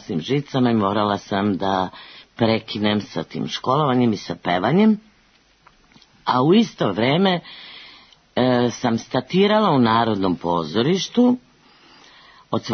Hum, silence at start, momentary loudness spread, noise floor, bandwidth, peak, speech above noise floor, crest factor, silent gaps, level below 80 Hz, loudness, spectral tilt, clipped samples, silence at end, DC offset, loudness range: none; 0.1 s; 11 LU; -57 dBFS; 6.6 kHz; -4 dBFS; 38 dB; 16 dB; none; -58 dBFS; -20 LUFS; -6 dB/octave; under 0.1%; 0 s; under 0.1%; 2 LU